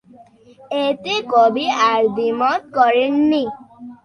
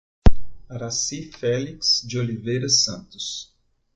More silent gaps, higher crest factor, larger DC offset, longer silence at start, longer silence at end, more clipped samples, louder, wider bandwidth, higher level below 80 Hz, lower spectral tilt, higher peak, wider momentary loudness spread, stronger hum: neither; about the same, 16 dB vs 18 dB; neither; first, 0.7 s vs 0.25 s; second, 0.1 s vs 0.5 s; neither; first, -17 LUFS vs -23 LUFS; first, 10.5 kHz vs 9 kHz; second, -62 dBFS vs -32 dBFS; about the same, -4.5 dB/octave vs -3.5 dB/octave; about the same, -2 dBFS vs -2 dBFS; second, 7 LU vs 13 LU; neither